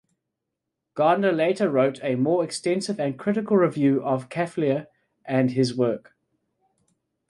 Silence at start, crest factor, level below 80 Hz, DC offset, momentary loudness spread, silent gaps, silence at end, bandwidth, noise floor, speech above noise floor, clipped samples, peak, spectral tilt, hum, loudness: 0.95 s; 16 dB; -70 dBFS; under 0.1%; 6 LU; none; 1.3 s; 11.5 kHz; -83 dBFS; 60 dB; under 0.1%; -8 dBFS; -6.5 dB/octave; none; -23 LUFS